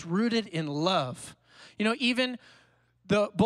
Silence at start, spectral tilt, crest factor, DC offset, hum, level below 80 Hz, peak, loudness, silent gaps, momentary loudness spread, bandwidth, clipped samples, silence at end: 0 s; -5.5 dB/octave; 18 dB; under 0.1%; none; -66 dBFS; -12 dBFS; -28 LUFS; none; 14 LU; 12.5 kHz; under 0.1%; 0 s